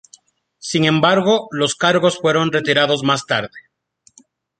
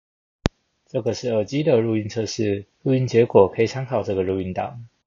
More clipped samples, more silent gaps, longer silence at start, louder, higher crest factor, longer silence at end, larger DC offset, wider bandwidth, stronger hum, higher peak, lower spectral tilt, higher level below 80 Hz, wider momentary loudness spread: neither; neither; first, 0.65 s vs 0.45 s; first, -16 LUFS vs -22 LUFS; about the same, 18 dB vs 22 dB; first, 1 s vs 0.2 s; neither; first, 9.4 kHz vs 7.4 kHz; neither; about the same, 0 dBFS vs 0 dBFS; second, -4.5 dB/octave vs -6.5 dB/octave; second, -60 dBFS vs -44 dBFS; second, 7 LU vs 11 LU